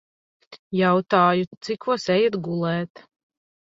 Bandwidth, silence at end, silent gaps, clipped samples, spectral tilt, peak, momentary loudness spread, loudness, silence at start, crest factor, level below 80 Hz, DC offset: 7.8 kHz; 0.85 s; 0.59-0.71 s, 1.47-1.51 s, 1.57-1.61 s; under 0.1%; -6.5 dB/octave; -4 dBFS; 11 LU; -22 LUFS; 0.5 s; 20 dB; -66 dBFS; under 0.1%